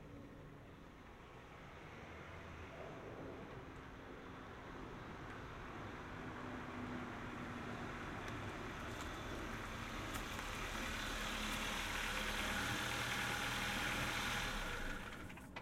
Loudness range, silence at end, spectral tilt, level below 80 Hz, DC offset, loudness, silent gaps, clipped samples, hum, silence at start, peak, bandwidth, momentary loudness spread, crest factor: 13 LU; 0 s; -3.5 dB/octave; -56 dBFS; under 0.1%; -44 LUFS; none; under 0.1%; none; 0 s; -26 dBFS; 16.5 kHz; 15 LU; 18 dB